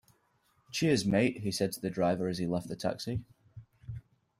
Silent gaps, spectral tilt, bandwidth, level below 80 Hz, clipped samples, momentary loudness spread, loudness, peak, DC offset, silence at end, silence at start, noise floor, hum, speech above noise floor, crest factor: none; -5.5 dB/octave; 16 kHz; -60 dBFS; under 0.1%; 18 LU; -32 LUFS; -14 dBFS; under 0.1%; 0.4 s; 0.7 s; -72 dBFS; none; 41 dB; 20 dB